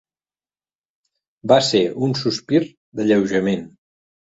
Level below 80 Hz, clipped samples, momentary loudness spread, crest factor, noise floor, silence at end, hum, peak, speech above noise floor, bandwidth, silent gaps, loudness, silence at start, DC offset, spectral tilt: -58 dBFS; under 0.1%; 10 LU; 20 dB; under -90 dBFS; 0.65 s; none; -2 dBFS; over 72 dB; 8 kHz; 2.77-2.92 s; -19 LUFS; 1.45 s; under 0.1%; -5.5 dB/octave